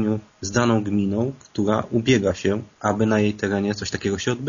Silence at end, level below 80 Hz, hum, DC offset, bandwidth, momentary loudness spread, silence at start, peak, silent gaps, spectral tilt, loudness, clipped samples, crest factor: 0 s; -52 dBFS; none; under 0.1%; 7.4 kHz; 6 LU; 0 s; -4 dBFS; none; -5.5 dB/octave; -22 LUFS; under 0.1%; 16 dB